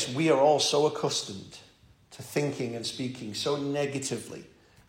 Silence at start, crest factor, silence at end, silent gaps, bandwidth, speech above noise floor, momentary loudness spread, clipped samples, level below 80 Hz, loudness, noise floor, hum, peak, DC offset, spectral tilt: 0 s; 18 dB; 0.4 s; none; 16.5 kHz; 27 dB; 21 LU; under 0.1%; -68 dBFS; -28 LUFS; -56 dBFS; none; -10 dBFS; under 0.1%; -4 dB/octave